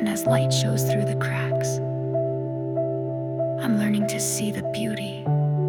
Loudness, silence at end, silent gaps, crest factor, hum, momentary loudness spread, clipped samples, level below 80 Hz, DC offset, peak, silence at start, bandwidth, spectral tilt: -24 LUFS; 0 s; none; 16 dB; 50 Hz at -60 dBFS; 6 LU; under 0.1%; -60 dBFS; under 0.1%; -8 dBFS; 0 s; 18 kHz; -5.5 dB/octave